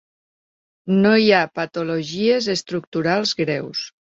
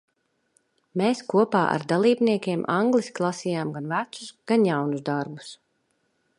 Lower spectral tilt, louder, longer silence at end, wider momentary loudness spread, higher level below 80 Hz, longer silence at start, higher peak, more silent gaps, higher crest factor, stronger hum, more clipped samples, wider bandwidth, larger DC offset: about the same, -5 dB/octave vs -6 dB/octave; first, -19 LUFS vs -24 LUFS; second, 0.15 s vs 0.85 s; about the same, 11 LU vs 13 LU; first, -62 dBFS vs -72 dBFS; about the same, 0.85 s vs 0.95 s; first, -2 dBFS vs -6 dBFS; first, 2.87-2.92 s vs none; about the same, 18 dB vs 20 dB; neither; neither; second, 7.8 kHz vs 11 kHz; neither